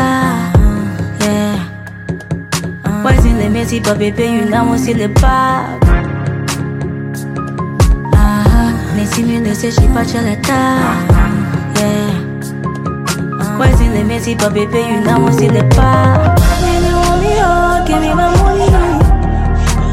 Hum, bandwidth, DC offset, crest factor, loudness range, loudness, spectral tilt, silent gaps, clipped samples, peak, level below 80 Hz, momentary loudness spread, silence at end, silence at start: none; 16 kHz; under 0.1%; 12 dB; 4 LU; -13 LUFS; -6 dB/octave; none; under 0.1%; 0 dBFS; -16 dBFS; 9 LU; 0 s; 0 s